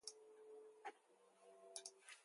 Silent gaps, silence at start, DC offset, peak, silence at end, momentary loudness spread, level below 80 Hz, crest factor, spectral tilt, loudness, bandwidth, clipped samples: none; 0 s; under 0.1%; -30 dBFS; 0 s; 10 LU; under -90 dBFS; 30 dB; 1 dB/octave; -59 LUFS; 11.5 kHz; under 0.1%